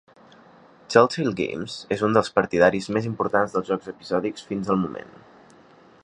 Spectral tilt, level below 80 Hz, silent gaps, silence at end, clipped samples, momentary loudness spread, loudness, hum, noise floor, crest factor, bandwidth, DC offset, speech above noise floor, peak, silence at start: -6 dB/octave; -58 dBFS; none; 0.95 s; under 0.1%; 10 LU; -23 LUFS; none; -52 dBFS; 24 dB; 10.5 kHz; under 0.1%; 29 dB; -2 dBFS; 0.9 s